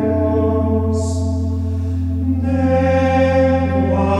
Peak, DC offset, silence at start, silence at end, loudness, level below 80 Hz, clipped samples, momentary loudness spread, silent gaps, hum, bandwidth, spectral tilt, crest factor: -4 dBFS; under 0.1%; 0 s; 0 s; -17 LUFS; -30 dBFS; under 0.1%; 6 LU; none; none; 9.4 kHz; -8 dB/octave; 12 dB